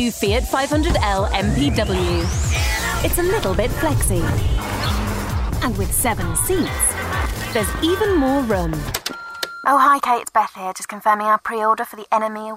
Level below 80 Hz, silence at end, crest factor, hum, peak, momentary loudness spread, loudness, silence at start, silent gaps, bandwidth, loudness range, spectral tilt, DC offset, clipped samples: -28 dBFS; 0 s; 16 dB; none; -4 dBFS; 6 LU; -19 LUFS; 0 s; none; 16.5 kHz; 2 LU; -4.5 dB/octave; under 0.1%; under 0.1%